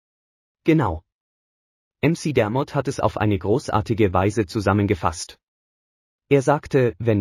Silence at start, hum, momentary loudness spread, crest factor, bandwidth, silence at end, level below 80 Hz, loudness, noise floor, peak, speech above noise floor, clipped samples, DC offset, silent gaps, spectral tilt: 0.65 s; none; 7 LU; 18 dB; 14.5 kHz; 0 s; -46 dBFS; -21 LUFS; under -90 dBFS; -4 dBFS; over 70 dB; under 0.1%; under 0.1%; 1.14-1.91 s, 5.43-6.19 s; -7 dB/octave